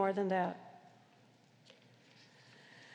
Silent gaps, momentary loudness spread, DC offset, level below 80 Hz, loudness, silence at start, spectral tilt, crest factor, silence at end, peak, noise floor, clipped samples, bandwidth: none; 28 LU; under 0.1%; under -90 dBFS; -36 LUFS; 0 s; -7 dB/octave; 20 dB; 0 s; -20 dBFS; -66 dBFS; under 0.1%; 9.2 kHz